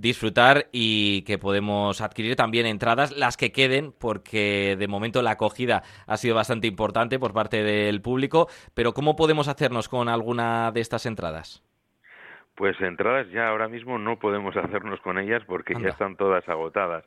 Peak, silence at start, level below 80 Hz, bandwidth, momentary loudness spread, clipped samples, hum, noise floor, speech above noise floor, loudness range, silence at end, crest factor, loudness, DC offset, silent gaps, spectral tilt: -2 dBFS; 0 s; -54 dBFS; 13 kHz; 8 LU; under 0.1%; none; -56 dBFS; 31 dB; 5 LU; 0.05 s; 22 dB; -24 LUFS; under 0.1%; none; -5 dB/octave